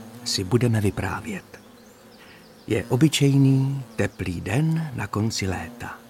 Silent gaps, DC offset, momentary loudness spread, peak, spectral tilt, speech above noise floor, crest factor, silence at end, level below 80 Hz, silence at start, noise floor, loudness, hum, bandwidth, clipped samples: none; under 0.1%; 13 LU; -6 dBFS; -5.5 dB/octave; 26 dB; 18 dB; 0.1 s; -50 dBFS; 0 s; -48 dBFS; -23 LUFS; none; 16 kHz; under 0.1%